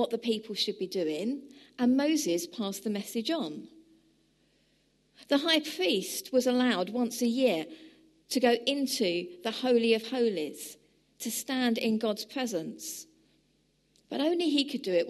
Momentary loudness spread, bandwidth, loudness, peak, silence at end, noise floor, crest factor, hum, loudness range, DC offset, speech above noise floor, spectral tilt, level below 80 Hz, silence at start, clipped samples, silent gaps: 12 LU; 13 kHz; -30 LUFS; -12 dBFS; 0 s; -70 dBFS; 20 dB; none; 5 LU; under 0.1%; 41 dB; -3.5 dB/octave; -78 dBFS; 0 s; under 0.1%; none